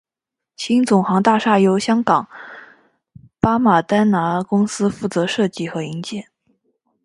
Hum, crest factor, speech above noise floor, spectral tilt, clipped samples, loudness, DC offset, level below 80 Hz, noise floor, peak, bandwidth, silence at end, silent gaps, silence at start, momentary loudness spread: none; 18 dB; 68 dB; -6 dB/octave; under 0.1%; -17 LUFS; under 0.1%; -54 dBFS; -85 dBFS; 0 dBFS; 11.5 kHz; 0.8 s; none; 0.6 s; 14 LU